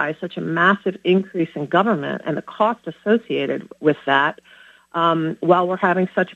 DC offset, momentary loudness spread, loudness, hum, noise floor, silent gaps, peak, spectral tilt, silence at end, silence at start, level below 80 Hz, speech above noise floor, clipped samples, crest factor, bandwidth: under 0.1%; 8 LU; -20 LUFS; none; -46 dBFS; none; 0 dBFS; -7.5 dB/octave; 0 s; 0 s; -68 dBFS; 26 dB; under 0.1%; 20 dB; 7.8 kHz